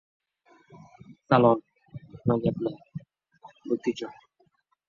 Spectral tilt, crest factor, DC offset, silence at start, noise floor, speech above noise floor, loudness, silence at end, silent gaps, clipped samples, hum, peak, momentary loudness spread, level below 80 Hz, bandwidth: -8 dB/octave; 24 dB; under 0.1%; 1.1 s; -69 dBFS; 44 dB; -26 LUFS; 0.75 s; none; under 0.1%; none; -6 dBFS; 25 LU; -60 dBFS; 7.2 kHz